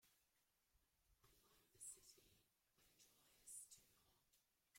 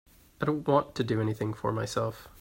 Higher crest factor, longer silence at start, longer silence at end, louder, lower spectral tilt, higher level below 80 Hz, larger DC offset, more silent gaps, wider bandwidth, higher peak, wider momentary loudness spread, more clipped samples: about the same, 24 dB vs 20 dB; second, 0 s vs 0.4 s; about the same, 0 s vs 0.1 s; second, -61 LUFS vs -30 LUFS; second, -0.5 dB/octave vs -6.5 dB/octave; second, -90 dBFS vs -58 dBFS; neither; neither; about the same, 16.5 kHz vs 16.5 kHz; second, -46 dBFS vs -10 dBFS; first, 10 LU vs 6 LU; neither